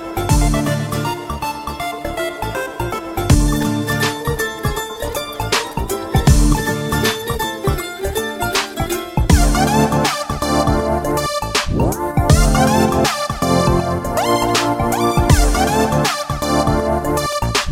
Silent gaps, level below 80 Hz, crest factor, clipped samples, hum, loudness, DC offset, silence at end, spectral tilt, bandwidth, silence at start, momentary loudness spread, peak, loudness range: none; -24 dBFS; 16 dB; under 0.1%; none; -17 LUFS; under 0.1%; 0 s; -5 dB/octave; 17 kHz; 0 s; 9 LU; 0 dBFS; 4 LU